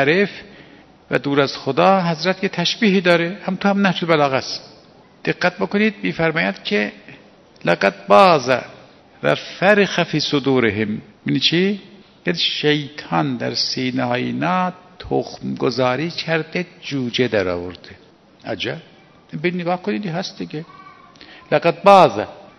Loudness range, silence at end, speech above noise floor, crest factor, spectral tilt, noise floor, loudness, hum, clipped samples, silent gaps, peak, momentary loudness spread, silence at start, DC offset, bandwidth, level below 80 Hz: 7 LU; 0.15 s; 30 dB; 20 dB; -5.5 dB/octave; -48 dBFS; -18 LUFS; none; under 0.1%; none; 0 dBFS; 13 LU; 0 s; under 0.1%; 12 kHz; -58 dBFS